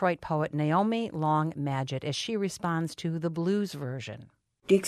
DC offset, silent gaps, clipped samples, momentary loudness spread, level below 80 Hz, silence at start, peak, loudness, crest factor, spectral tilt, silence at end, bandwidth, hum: under 0.1%; none; under 0.1%; 10 LU; -66 dBFS; 0 s; -10 dBFS; -30 LUFS; 18 dB; -6 dB/octave; 0 s; 13.5 kHz; none